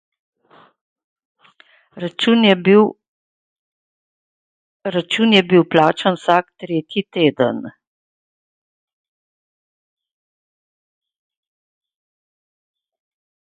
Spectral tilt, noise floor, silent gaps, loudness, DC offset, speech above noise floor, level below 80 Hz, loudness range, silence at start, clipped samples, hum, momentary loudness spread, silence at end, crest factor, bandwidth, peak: -6 dB/octave; -52 dBFS; 3.08-4.80 s; -16 LUFS; under 0.1%; 37 dB; -66 dBFS; 7 LU; 1.95 s; under 0.1%; none; 15 LU; 5.8 s; 20 dB; 9.4 kHz; 0 dBFS